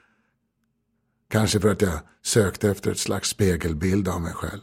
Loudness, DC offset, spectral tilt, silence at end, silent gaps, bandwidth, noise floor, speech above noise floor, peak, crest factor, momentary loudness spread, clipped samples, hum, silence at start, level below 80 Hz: -24 LUFS; under 0.1%; -5 dB/octave; 0 s; none; 16.5 kHz; -73 dBFS; 50 dB; -4 dBFS; 20 dB; 7 LU; under 0.1%; none; 1.3 s; -42 dBFS